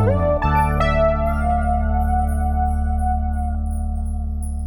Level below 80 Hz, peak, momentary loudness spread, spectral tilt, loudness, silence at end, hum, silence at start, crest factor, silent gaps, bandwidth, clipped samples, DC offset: -22 dBFS; -6 dBFS; 8 LU; -8 dB/octave; -21 LUFS; 0 s; none; 0 s; 12 dB; none; 13.5 kHz; under 0.1%; under 0.1%